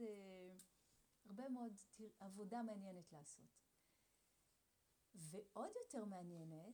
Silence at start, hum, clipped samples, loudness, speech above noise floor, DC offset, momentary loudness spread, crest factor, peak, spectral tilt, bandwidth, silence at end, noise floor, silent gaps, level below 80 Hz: 0 s; none; under 0.1%; -55 LUFS; 29 dB; under 0.1%; 11 LU; 18 dB; -38 dBFS; -6 dB/octave; over 20 kHz; 0 s; -83 dBFS; none; under -90 dBFS